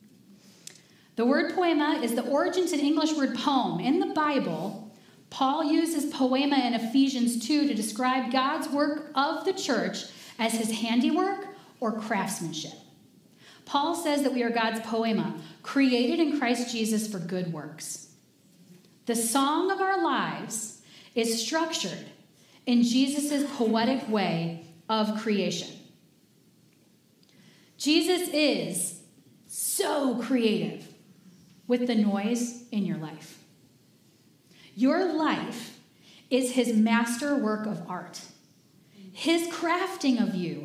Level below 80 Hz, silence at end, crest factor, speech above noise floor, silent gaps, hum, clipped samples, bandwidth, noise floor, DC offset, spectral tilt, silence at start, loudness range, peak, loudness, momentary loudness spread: -86 dBFS; 0 s; 18 dB; 35 dB; none; none; under 0.1%; 16 kHz; -62 dBFS; under 0.1%; -4 dB/octave; 0.3 s; 5 LU; -10 dBFS; -27 LUFS; 13 LU